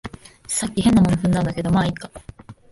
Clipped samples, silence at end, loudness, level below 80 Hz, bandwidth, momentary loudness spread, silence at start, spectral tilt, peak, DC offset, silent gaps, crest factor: under 0.1%; 0.2 s; -19 LUFS; -40 dBFS; 11.5 kHz; 22 LU; 0.05 s; -5.5 dB/octave; -4 dBFS; under 0.1%; none; 16 dB